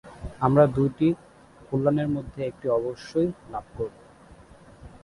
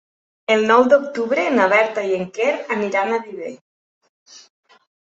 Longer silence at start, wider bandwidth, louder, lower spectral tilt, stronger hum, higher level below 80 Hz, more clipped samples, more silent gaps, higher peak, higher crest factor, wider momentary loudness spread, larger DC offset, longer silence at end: second, 0.05 s vs 0.5 s; first, 11.5 kHz vs 8 kHz; second, -25 LUFS vs -18 LUFS; first, -9 dB/octave vs -4.5 dB/octave; neither; first, -50 dBFS vs -68 dBFS; neither; second, none vs 3.61-4.01 s, 4.09-4.26 s; second, -6 dBFS vs -2 dBFS; about the same, 20 dB vs 18 dB; about the same, 15 LU vs 16 LU; neither; second, 0.05 s vs 0.7 s